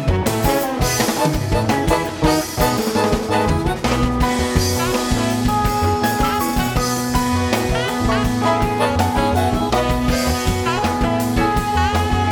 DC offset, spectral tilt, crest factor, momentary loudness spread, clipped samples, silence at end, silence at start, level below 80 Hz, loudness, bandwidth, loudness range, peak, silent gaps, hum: under 0.1%; -5 dB/octave; 16 dB; 2 LU; under 0.1%; 0 s; 0 s; -28 dBFS; -18 LUFS; 19 kHz; 0 LU; -2 dBFS; none; none